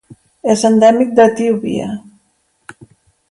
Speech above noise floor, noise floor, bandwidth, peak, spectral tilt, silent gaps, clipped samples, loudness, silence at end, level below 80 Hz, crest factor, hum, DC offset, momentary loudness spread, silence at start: 49 dB; -61 dBFS; 11.5 kHz; 0 dBFS; -5.5 dB/octave; none; under 0.1%; -13 LUFS; 1.3 s; -56 dBFS; 14 dB; none; under 0.1%; 14 LU; 0.45 s